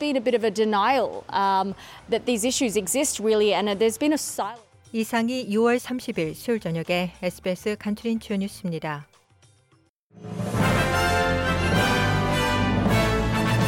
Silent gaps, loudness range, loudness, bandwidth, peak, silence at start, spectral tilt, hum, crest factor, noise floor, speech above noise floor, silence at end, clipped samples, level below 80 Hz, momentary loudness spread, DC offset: 9.89-10.10 s; 7 LU; -24 LUFS; 16.5 kHz; -10 dBFS; 0 s; -4.5 dB/octave; none; 14 dB; -63 dBFS; 38 dB; 0 s; under 0.1%; -42 dBFS; 9 LU; under 0.1%